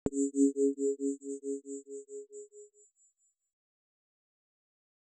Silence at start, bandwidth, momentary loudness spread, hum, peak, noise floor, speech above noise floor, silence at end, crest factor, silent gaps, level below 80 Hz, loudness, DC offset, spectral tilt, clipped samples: 0.05 s; 9.4 kHz; 20 LU; none; -14 dBFS; -73 dBFS; 43 dB; 2.35 s; 22 dB; none; -68 dBFS; -33 LUFS; under 0.1%; -7 dB/octave; under 0.1%